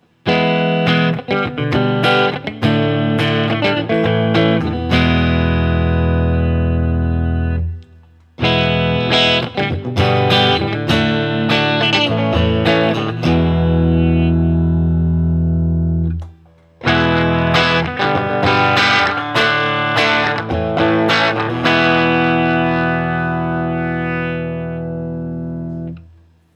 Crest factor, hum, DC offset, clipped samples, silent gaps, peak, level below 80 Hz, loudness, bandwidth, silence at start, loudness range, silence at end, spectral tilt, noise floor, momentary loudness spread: 16 dB; none; under 0.1%; under 0.1%; none; 0 dBFS; -32 dBFS; -15 LUFS; 8.4 kHz; 0.25 s; 3 LU; 0.55 s; -6.5 dB/octave; -47 dBFS; 7 LU